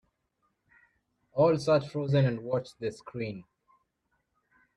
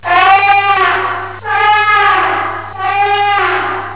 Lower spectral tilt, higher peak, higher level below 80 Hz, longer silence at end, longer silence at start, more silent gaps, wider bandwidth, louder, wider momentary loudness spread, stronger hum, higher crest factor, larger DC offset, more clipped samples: about the same, -7.5 dB/octave vs -6.5 dB/octave; second, -12 dBFS vs 0 dBFS; second, -66 dBFS vs -46 dBFS; first, 1.35 s vs 0 s; first, 1.35 s vs 0.05 s; neither; first, 11 kHz vs 4 kHz; second, -29 LUFS vs -11 LUFS; about the same, 12 LU vs 10 LU; second, none vs 50 Hz at -40 dBFS; first, 18 dB vs 10 dB; second, under 0.1% vs 1%; neither